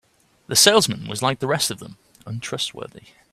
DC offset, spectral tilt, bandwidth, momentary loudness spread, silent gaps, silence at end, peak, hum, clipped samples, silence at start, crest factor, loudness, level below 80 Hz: under 0.1%; -2.5 dB/octave; 16 kHz; 21 LU; none; 0.35 s; 0 dBFS; none; under 0.1%; 0.5 s; 22 dB; -19 LUFS; -58 dBFS